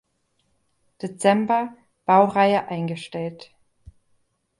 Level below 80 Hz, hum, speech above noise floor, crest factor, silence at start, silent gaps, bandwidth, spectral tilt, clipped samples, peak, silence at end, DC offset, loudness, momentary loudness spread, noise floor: -62 dBFS; none; 49 dB; 20 dB; 1.05 s; none; 11.5 kHz; -6 dB/octave; under 0.1%; -4 dBFS; 1.15 s; under 0.1%; -21 LUFS; 16 LU; -70 dBFS